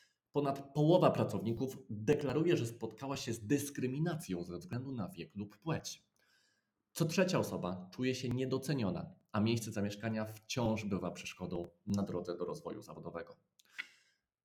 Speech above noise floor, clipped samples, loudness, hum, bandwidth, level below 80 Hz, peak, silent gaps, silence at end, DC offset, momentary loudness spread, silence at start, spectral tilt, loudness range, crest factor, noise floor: 44 dB; under 0.1%; -37 LUFS; none; 18.5 kHz; -68 dBFS; -12 dBFS; none; 0.55 s; under 0.1%; 14 LU; 0.35 s; -6 dB/octave; 8 LU; 24 dB; -80 dBFS